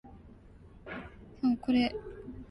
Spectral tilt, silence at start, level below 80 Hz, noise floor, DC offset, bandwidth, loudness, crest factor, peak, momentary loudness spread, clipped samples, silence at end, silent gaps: -7 dB/octave; 0.05 s; -54 dBFS; -54 dBFS; under 0.1%; 5.8 kHz; -32 LUFS; 16 dB; -18 dBFS; 23 LU; under 0.1%; 0.05 s; none